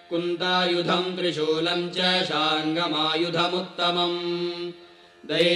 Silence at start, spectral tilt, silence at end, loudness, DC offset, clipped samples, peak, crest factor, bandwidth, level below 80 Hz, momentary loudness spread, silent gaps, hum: 0.1 s; -4.5 dB/octave; 0 s; -24 LUFS; under 0.1%; under 0.1%; -10 dBFS; 16 dB; 11 kHz; -70 dBFS; 6 LU; none; none